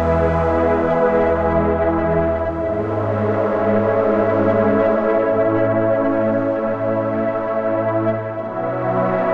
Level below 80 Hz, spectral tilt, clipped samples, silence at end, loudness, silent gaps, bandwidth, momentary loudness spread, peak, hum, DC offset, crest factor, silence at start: -36 dBFS; -9.5 dB/octave; under 0.1%; 0 s; -18 LUFS; none; 6.2 kHz; 5 LU; -4 dBFS; none; 0.6%; 14 dB; 0 s